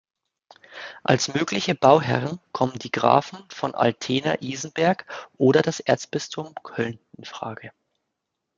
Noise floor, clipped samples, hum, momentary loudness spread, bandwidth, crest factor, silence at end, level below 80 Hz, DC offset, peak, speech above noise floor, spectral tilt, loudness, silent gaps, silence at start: -81 dBFS; under 0.1%; none; 18 LU; 9.2 kHz; 22 dB; 0.9 s; -64 dBFS; under 0.1%; -2 dBFS; 58 dB; -5 dB/octave; -23 LUFS; none; 0.7 s